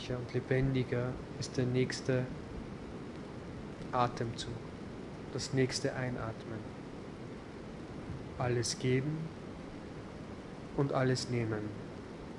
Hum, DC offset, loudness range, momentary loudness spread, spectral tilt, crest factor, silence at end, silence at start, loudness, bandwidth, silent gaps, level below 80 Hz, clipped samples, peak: none; under 0.1%; 3 LU; 14 LU; -5.5 dB/octave; 20 dB; 0 s; 0 s; -37 LUFS; 11.5 kHz; none; -56 dBFS; under 0.1%; -16 dBFS